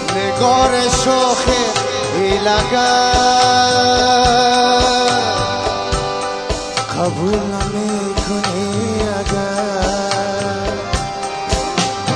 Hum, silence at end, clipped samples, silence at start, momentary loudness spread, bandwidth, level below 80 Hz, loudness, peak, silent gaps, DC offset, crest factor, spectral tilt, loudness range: none; 0 s; under 0.1%; 0 s; 8 LU; 10.5 kHz; -30 dBFS; -15 LUFS; 0 dBFS; none; 0.1%; 16 dB; -3.5 dB/octave; 6 LU